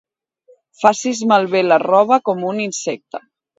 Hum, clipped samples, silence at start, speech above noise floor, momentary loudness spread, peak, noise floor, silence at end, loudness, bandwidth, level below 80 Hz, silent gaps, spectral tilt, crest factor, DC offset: none; under 0.1%; 0.8 s; 38 dB; 13 LU; 0 dBFS; -54 dBFS; 0.4 s; -16 LUFS; 8 kHz; -68 dBFS; none; -4 dB/octave; 18 dB; under 0.1%